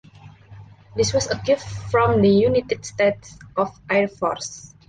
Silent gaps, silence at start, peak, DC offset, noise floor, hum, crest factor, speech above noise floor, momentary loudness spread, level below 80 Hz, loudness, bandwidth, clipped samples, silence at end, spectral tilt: none; 0.25 s; -6 dBFS; under 0.1%; -45 dBFS; none; 16 dB; 24 dB; 14 LU; -46 dBFS; -21 LUFS; 9.8 kHz; under 0.1%; 0.25 s; -5 dB/octave